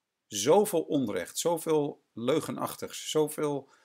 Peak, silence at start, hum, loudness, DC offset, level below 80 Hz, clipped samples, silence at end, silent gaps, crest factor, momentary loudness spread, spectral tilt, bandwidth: -12 dBFS; 0.3 s; none; -29 LUFS; under 0.1%; -76 dBFS; under 0.1%; 0.2 s; none; 18 dB; 11 LU; -4 dB/octave; 16 kHz